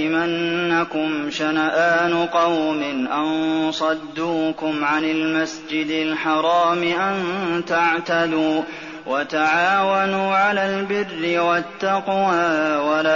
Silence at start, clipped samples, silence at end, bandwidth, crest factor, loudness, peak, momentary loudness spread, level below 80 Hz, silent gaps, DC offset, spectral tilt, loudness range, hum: 0 s; under 0.1%; 0 s; 7.2 kHz; 12 dB; -20 LUFS; -8 dBFS; 6 LU; -62 dBFS; none; 0.1%; -2.5 dB/octave; 2 LU; none